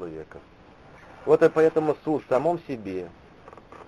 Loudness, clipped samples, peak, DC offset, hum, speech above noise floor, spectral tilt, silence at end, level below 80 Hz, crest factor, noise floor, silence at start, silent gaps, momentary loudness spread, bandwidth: -24 LUFS; under 0.1%; -6 dBFS; under 0.1%; none; 26 dB; -7.5 dB/octave; 0.05 s; -58 dBFS; 20 dB; -49 dBFS; 0 s; none; 20 LU; 9.4 kHz